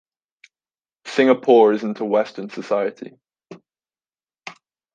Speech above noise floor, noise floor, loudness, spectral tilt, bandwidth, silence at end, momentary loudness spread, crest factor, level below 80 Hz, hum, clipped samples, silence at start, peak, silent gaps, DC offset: over 72 dB; under -90 dBFS; -18 LUFS; -6 dB/octave; 9 kHz; 0.45 s; 25 LU; 20 dB; -76 dBFS; none; under 0.1%; 1.05 s; -2 dBFS; none; under 0.1%